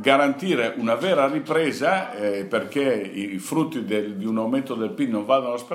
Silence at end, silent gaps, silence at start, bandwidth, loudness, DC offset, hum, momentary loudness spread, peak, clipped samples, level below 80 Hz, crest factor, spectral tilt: 0 s; none; 0 s; 16 kHz; -23 LUFS; under 0.1%; none; 6 LU; -2 dBFS; under 0.1%; -78 dBFS; 22 dB; -5 dB/octave